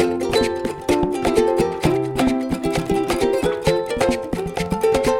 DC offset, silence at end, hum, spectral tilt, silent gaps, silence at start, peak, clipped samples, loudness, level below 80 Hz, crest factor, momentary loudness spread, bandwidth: under 0.1%; 0 s; none; -5.5 dB/octave; none; 0 s; -2 dBFS; under 0.1%; -20 LUFS; -38 dBFS; 16 dB; 5 LU; 17.5 kHz